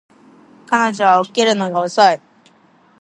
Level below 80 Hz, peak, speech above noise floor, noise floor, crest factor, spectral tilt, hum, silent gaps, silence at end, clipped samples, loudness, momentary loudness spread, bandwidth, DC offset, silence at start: -72 dBFS; 0 dBFS; 37 dB; -52 dBFS; 16 dB; -3.5 dB/octave; none; none; 0.85 s; under 0.1%; -15 LUFS; 6 LU; 11 kHz; under 0.1%; 0.7 s